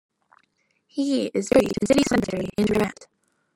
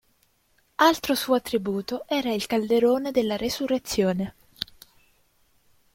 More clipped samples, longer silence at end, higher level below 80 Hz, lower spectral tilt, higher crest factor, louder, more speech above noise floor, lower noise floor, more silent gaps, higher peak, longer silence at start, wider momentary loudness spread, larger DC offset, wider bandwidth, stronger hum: neither; second, 0.5 s vs 1.3 s; first, -50 dBFS vs -56 dBFS; about the same, -5 dB/octave vs -4.5 dB/octave; about the same, 18 dB vs 22 dB; first, -22 LUFS vs -25 LUFS; first, 47 dB vs 42 dB; about the same, -69 dBFS vs -66 dBFS; neither; about the same, -6 dBFS vs -4 dBFS; first, 0.95 s vs 0.8 s; second, 8 LU vs 14 LU; neither; about the same, 16.5 kHz vs 16.5 kHz; neither